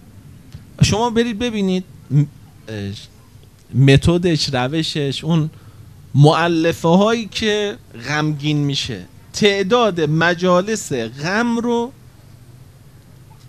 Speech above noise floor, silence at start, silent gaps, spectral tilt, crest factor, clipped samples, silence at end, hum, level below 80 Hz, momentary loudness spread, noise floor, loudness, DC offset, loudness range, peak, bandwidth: 28 dB; 0.15 s; none; -5.5 dB/octave; 18 dB; under 0.1%; 0 s; none; -42 dBFS; 13 LU; -45 dBFS; -17 LUFS; 0.2%; 4 LU; 0 dBFS; 14 kHz